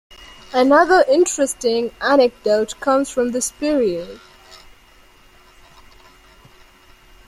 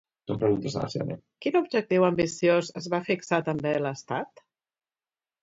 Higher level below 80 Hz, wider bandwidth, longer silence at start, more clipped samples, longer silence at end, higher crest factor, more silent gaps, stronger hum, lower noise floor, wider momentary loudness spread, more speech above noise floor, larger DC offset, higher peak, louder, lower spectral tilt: first, -52 dBFS vs -62 dBFS; first, 15.5 kHz vs 8 kHz; about the same, 0.2 s vs 0.3 s; neither; first, 3.1 s vs 1.15 s; about the same, 18 dB vs 20 dB; neither; neither; second, -49 dBFS vs under -90 dBFS; about the same, 8 LU vs 10 LU; second, 33 dB vs over 64 dB; neither; first, -2 dBFS vs -8 dBFS; first, -17 LUFS vs -27 LUFS; second, -3 dB/octave vs -6 dB/octave